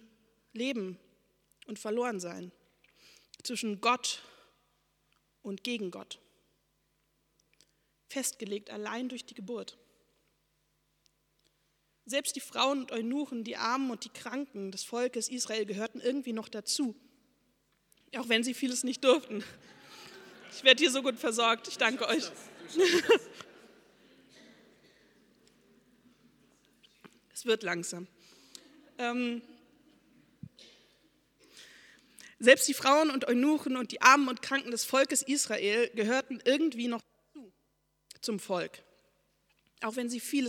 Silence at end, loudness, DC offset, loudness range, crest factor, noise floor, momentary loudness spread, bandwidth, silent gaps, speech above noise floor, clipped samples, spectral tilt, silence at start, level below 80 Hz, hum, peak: 0 s; -30 LUFS; under 0.1%; 14 LU; 28 dB; -76 dBFS; 20 LU; 18.5 kHz; none; 46 dB; under 0.1%; -2 dB/octave; 0.55 s; -80 dBFS; none; -4 dBFS